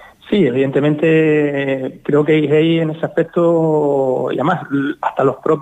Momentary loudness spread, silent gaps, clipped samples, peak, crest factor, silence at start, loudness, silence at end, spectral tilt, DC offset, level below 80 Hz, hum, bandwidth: 6 LU; none; under 0.1%; -4 dBFS; 12 dB; 0 s; -15 LUFS; 0 s; -8.5 dB/octave; under 0.1%; -58 dBFS; none; 9 kHz